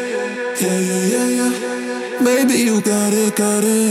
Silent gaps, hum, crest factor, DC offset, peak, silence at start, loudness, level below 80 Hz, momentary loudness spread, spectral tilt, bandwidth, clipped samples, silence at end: none; none; 14 dB; under 0.1%; -2 dBFS; 0 s; -17 LUFS; -84 dBFS; 8 LU; -4 dB/octave; 16.5 kHz; under 0.1%; 0 s